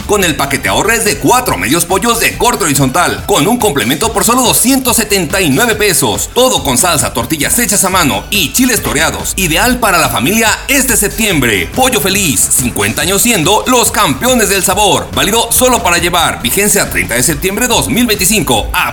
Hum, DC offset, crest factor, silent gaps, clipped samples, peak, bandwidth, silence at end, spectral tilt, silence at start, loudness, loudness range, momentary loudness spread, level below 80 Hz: none; under 0.1%; 10 dB; none; 0.3%; 0 dBFS; 19 kHz; 0 s; -2.5 dB/octave; 0 s; -9 LUFS; 1 LU; 3 LU; -28 dBFS